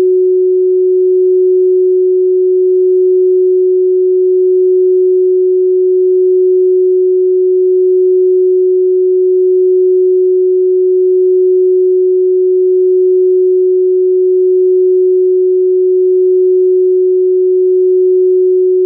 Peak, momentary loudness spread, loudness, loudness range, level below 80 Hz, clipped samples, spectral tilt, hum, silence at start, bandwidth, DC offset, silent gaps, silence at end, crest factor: -6 dBFS; 1 LU; -9 LUFS; 0 LU; under -90 dBFS; under 0.1%; -15.5 dB/octave; none; 0 s; 0.5 kHz; under 0.1%; none; 0 s; 4 dB